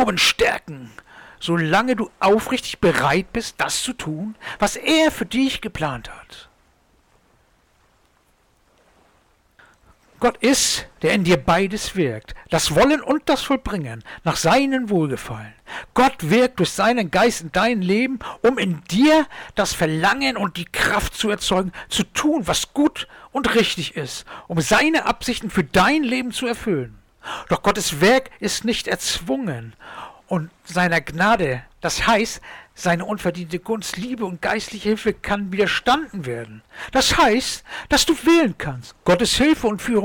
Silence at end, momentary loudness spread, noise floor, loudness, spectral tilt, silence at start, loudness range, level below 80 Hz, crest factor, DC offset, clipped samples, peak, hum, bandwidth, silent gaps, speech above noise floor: 0 s; 13 LU; -60 dBFS; -20 LUFS; -4 dB/octave; 0 s; 4 LU; -42 dBFS; 12 dB; under 0.1%; under 0.1%; -8 dBFS; none; 19 kHz; none; 40 dB